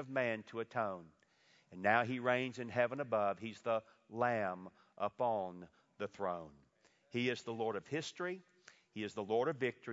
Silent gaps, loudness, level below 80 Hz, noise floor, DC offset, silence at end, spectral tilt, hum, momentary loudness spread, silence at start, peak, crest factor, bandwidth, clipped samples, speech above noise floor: none; -39 LUFS; -82 dBFS; -72 dBFS; under 0.1%; 0 s; -3.5 dB/octave; none; 13 LU; 0 s; -16 dBFS; 24 dB; 7.6 kHz; under 0.1%; 34 dB